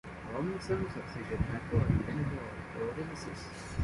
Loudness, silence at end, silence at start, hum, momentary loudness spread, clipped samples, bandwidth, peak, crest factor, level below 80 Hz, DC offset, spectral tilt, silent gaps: -36 LUFS; 0 s; 0.05 s; none; 10 LU; under 0.1%; 11.5 kHz; -16 dBFS; 18 dB; -46 dBFS; under 0.1%; -7 dB/octave; none